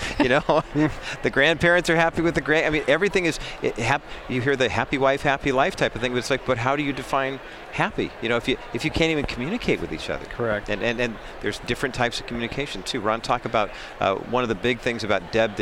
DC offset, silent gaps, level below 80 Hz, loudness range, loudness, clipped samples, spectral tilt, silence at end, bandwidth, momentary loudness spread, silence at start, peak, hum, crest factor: under 0.1%; none; -42 dBFS; 5 LU; -23 LUFS; under 0.1%; -5 dB/octave; 0 s; 16.5 kHz; 8 LU; 0 s; -6 dBFS; none; 18 dB